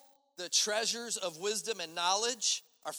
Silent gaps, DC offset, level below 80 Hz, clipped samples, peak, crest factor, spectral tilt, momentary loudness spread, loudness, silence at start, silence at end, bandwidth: none; under 0.1%; under -90 dBFS; under 0.1%; -14 dBFS; 20 dB; 0.5 dB/octave; 7 LU; -32 LUFS; 0.4 s; 0 s; over 20 kHz